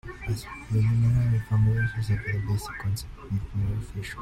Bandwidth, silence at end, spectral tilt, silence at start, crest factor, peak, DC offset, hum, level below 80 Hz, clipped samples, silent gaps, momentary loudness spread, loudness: 13.5 kHz; 0 s; -7 dB/octave; 0.05 s; 12 dB; -14 dBFS; under 0.1%; none; -40 dBFS; under 0.1%; none; 10 LU; -27 LUFS